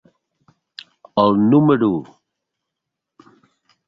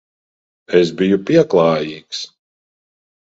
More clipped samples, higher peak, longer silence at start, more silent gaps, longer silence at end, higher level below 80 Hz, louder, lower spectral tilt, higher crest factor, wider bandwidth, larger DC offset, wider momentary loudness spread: neither; about the same, -2 dBFS vs 0 dBFS; first, 1.15 s vs 0.7 s; neither; first, 1.85 s vs 1 s; about the same, -58 dBFS vs -56 dBFS; about the same, -16 LUFS vs -15 LUFS; first, -10 dB/octave vs -6 dB/octave; about the same, 18 dB vs 18 dB; second, 5.4 kHz vs 8 kHz; neither; first, 25 LU vs 14 LU